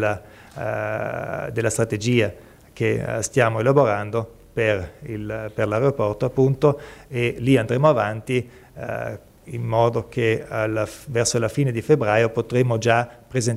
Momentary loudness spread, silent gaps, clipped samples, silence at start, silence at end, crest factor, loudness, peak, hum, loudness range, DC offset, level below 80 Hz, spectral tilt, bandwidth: 13 LU; none; under 0.1%; 0 s; 0 s; 18 dB; -22 LUFS; -4 dBFS; none; 3 LU; under 0.1%; -50 dBFS; -5.5 dB/octave; 15.5 kHz